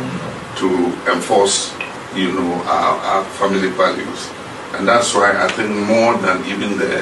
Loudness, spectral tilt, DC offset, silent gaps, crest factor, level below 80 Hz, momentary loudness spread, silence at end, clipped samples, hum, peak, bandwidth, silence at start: -17 LUFS; -3.5 dB/octave; under 0.1%; none; 16 dB; -54 dBFS; 12 LU; 0 s; under 0.1%; none; -2 dBFS; 12 kHz; 0 s